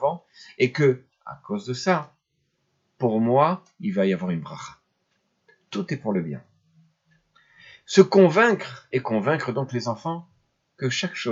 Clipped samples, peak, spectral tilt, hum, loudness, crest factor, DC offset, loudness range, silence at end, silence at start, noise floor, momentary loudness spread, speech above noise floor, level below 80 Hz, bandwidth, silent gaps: under 0.1%; 0 dBFS; -6 dB/octave; none; -23 LUFS; 24 dB; under 0.1%; 10 LU; 0 s; 0 s; -73 dBFS; 19 LU; 51 dB; -72 dBFS; 7.8 kHz; none